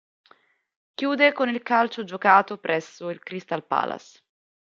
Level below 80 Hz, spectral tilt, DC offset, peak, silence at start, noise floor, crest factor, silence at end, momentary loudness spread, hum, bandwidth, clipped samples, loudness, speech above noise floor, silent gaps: -78 dBFS; -5 dB/octave; under 0.1%; -2 dBFS; 1 s; -60 dBFS; 22 dB; 0.65 s; 16 LU; none; 7.4 kHz; under 0.1%; -23 LUFS; 37 dB; none